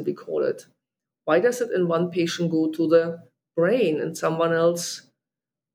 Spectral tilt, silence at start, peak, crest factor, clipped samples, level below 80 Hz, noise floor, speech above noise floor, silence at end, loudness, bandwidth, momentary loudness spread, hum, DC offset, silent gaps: -5.5 dB/octave; 0 s; -6 dBFS; 18 dB; under 0.1%; -82 dBFS; -89 dBFS; 67 dB; 0.75 s; -23 LUFS; 15.5 kHz; 11 LU; none; under 0.1%; none